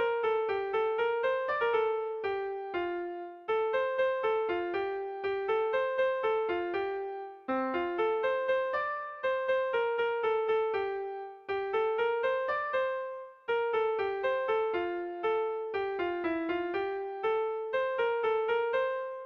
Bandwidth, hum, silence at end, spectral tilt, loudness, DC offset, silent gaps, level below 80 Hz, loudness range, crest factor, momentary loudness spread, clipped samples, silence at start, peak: 5.8 kHz; none; 0 s; -6 dB/octave; -31 LUFS; under 0.1%; none; -68 dBFS; 2 LU; 12 dB; 6 LU; under 0.1%; 0 s; -18 dBFS